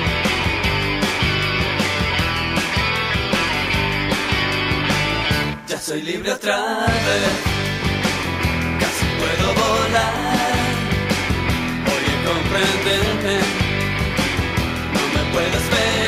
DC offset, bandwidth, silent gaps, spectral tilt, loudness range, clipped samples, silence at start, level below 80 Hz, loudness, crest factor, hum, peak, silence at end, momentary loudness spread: under 0.1%; 15.5 kHz; none; -4 dB/octave; 1 LU; under 0.1%; 0 s; -32 dBFS; -19 LUFS; 14 dB; none; -4 dBFS; 0 s; 3 LU